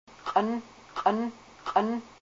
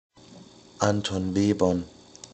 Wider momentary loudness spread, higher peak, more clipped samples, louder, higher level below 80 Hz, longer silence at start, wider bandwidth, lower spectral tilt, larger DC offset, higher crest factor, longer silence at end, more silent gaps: second, 9 LU vs 15 LU; second, -10 dBFS vs -6 dBFS; neither; second, -29 LUFS vs -25 LUFS; second, -66 dBFS vs -58 dBFS; second, 0.1 s vs 0.3 s; second, 7.8 kHz vs 8.8 kHz; about the same, -6 dB/octave vs -5.5 dB/octave; neither; about the same, 20 dB vs 22 dB; about the same, 0.1 s vs 0.1 s; neither